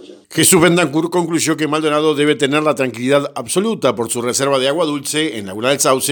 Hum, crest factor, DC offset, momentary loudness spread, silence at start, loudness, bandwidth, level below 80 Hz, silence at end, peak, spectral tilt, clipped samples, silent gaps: none; 16 dB; under 0.1%; 7 LU; 0 s; -15 LUFS; 19.5 kHz; -58 dBFS; 0 s; 0 dBFS; -3.5 dB/octave; under 0.1%; none